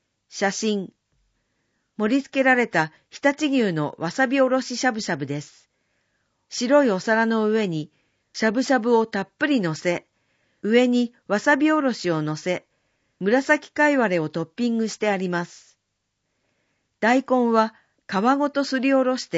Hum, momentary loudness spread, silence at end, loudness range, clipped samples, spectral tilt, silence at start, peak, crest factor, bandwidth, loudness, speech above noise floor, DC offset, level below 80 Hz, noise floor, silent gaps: none; 10 LU; 0 s; 3 LU; under 0.1%; -5 dB/octave; 0.35 s; -4 dBFS; 18 dB; 8 kHz; -22 LUFS; 55 dB; under 0.1%; -72 dBFS; -76 dBFS; none